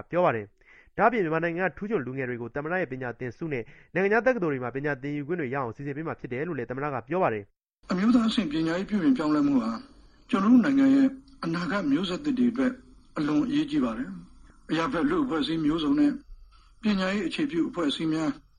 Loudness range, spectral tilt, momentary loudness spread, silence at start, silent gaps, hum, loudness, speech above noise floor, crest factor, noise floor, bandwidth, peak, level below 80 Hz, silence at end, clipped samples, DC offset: 5 LU; -6.5 dB/octave; 11 LU; 0.1 s; none; none; -27 LUFS; 26 dB; 20 dB; -52 dBFS; 9.8 kHz; -8 dBFS; -54 dBFS; 0.2 s; under 0.1%; under 0.1%